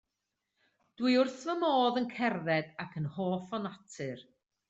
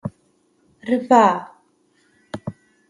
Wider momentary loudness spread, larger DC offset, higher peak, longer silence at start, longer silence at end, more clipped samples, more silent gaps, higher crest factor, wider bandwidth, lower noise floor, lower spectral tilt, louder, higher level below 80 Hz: second, 14 LU vs 21 LU; neither; second, -16 dBFS vs -2 dBFS; first, 1 s vs 0.05 s; about the same, 0.45 s vs 0.4 s; neither; neither; about the same, 16 dB vs 20 dB; second, 8 kHz vs 11.5 kHz; first, -86 dBFS vs -62 dBFS; about the same, -6 dB/octave vs -6 dB/octave; second, -32 LUFS vs -17 LUFS; second, -76 dBFS vs -60 dBFS